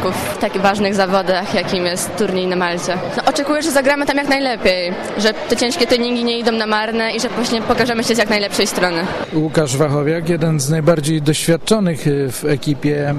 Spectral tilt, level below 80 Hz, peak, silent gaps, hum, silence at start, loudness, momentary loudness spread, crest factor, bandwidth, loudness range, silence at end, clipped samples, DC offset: -4.5 dB/octave; -44 dBFS; -2 dBFS; none; none; 0 s; -16 LUFS; 4 LU; 14 dB; 14.5 kHz; 1 LU; 0 s; under 0.1%; under 0.1%